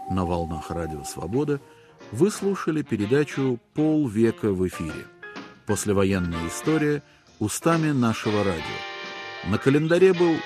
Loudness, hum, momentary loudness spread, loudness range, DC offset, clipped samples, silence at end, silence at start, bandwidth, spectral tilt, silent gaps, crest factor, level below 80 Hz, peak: -24 LUFS; none; 12 LU; 2 LU; under 0.1%; under 0.1%; 0 s; 0 s; 14.5 kHz; -6 dB/octave; none; 18 dB; -50 dBFS; -6 dBFS